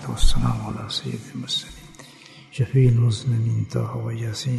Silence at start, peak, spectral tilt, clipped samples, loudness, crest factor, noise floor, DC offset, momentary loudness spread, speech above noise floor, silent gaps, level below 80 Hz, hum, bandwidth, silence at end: 0 s; -4 dBFS; -6 dB/octave; under 0.1%; -23 LUFS; 18 dB; -46 dBFS; under 0.1%; 22 LU; 25 dB; none; -28 dBFS; none; 12.5 kHz; 0 s